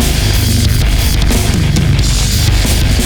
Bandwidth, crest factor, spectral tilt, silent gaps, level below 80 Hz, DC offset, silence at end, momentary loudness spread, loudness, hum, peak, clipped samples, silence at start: over 20 kHz; 10 dB; -4.5 dB/octave; none; -14 dBFS; under 0.1%; 0 s; 1 LU; -12 LUFS; none; 0 dBFS; under 0.1%; 0 s